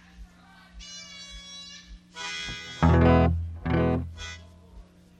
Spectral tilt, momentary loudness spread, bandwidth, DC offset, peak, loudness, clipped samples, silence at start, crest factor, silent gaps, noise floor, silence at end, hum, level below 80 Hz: -6.5 dB/octave; 23 LU; 8.8 kHz; under 0.1%; -8 dBFS; -25 LUFS; under 0.1%; 0.2 s; 18 dB; none; -53 dBFS; 0.4 s; none; -36 dBFS